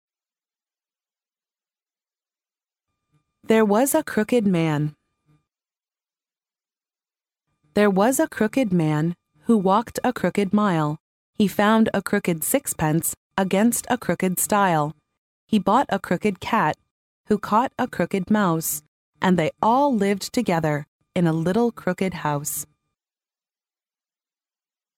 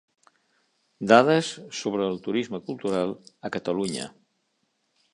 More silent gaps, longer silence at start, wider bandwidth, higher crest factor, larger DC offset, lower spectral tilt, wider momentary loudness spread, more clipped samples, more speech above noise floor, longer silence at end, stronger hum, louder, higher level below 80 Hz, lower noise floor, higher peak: first, 11.00-11.33 s, 13.17-13.30 s, 15.18-15.48 s, 16.91-17.24 s, 18.88-19.12 s, 20.88-20.99 s vs none; first, 3.5 s vs 1 s; first, 17 kHz vs 11.5 kHz; second, 18 dB vs 24 dB; neither; about the same, -5.5 dB/octave vs -5 dB/octave; second, 7 LU vs 16 LU; neither; first, over 69 dB vs 49 dB; first, 2.35 s vs 1.05 s; neither; first, -22 LUFS vs -25 LUFS; first, -58 dBFS vs -68 dBFS; first, under -90 dBFS vs -73 dBFS; second, -6 dBFS vs -2 dBFS